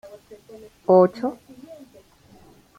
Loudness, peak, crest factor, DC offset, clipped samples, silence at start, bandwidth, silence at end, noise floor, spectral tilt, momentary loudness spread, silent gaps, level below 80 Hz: -20 LUFS; -4 dBFS; 20 dB; under 0.1%; under 0.1%; 0.9 s; 10 kHz; 1.05 s; -52 dBFS; -8.5 dB/octave; 27 LU; none; -64 dBFS